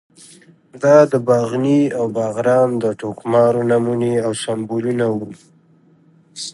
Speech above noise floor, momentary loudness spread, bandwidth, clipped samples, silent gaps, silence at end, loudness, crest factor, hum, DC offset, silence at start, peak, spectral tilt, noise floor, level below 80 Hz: 36 dB; 10 LU; 11.5 kHz; under 0.1%; none; 0.05 s; -17 LUFS; 16 dB; none; under 0.1%; 0.75 s; 0 dBFS; -6.5 dB/octave; -52 dBFS; -62 dBFS